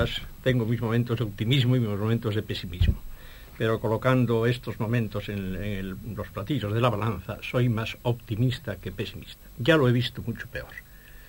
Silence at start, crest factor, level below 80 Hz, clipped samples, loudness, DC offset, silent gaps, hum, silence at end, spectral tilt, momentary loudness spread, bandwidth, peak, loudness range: 0 s; 20 dB; -40 dBFS; under 0.1%; -27 LUFS; under 0.1%; none; none; 0 s; -7 dB/octave; 13 LU; 17 kHz; -6 dBFS; 2 LU